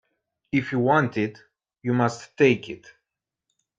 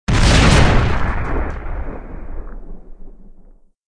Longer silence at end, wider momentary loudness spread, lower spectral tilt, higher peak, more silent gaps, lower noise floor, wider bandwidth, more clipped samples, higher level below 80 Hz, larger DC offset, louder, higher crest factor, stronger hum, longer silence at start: first, 1.05 s vs 0.6 s; second, 12 LU vs 23 LU; first, -7 dB/octave vs -5 dB/octave; second, -4 dBFS vs 0 dBFS; neither; first, -84 dBFS vs -44 dBFS; second, 8.8 kHz vs 10.5 kHz; neither; second, -66 dBFS vs -20 dBFS; neither; second, -24 LUFS vs -15 LUFS; about the same, 20 dB vs 16 dB; neither; first, 0.55 s vs 0.1 s